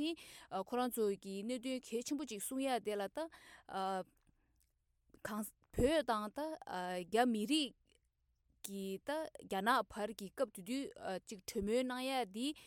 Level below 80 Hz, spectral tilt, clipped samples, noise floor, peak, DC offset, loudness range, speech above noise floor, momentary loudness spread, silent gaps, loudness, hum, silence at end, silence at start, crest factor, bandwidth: -62 dBFS; -4 dB/octave; under 0.1%; -80 dBFS; -20 dBFS; under 0.1%; 5 LU; 41 dB; 11 LU; none; -40 LUFS; none; 0 s; 0 s; 20 dB; 18 kHz